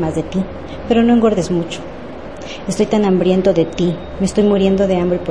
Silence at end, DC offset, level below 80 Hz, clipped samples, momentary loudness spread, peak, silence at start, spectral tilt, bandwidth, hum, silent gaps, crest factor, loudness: 0 s; 1%; -38 dBFS; under 0.1%; 16 LU; 0 dBFS; 0 s; -6.5 dB/octave; 11 kHz; none; none; 14 dB; -16 LUFS